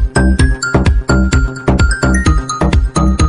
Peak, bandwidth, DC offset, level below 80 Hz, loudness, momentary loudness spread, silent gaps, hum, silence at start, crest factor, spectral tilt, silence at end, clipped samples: 0 dBFS; 11 kHz; under 0.1%; -14 dBFS; -13 LUFS; 2 LU; none; none; 0 s; 10 dB; -6 dB/octave; 0 s; under 0.1%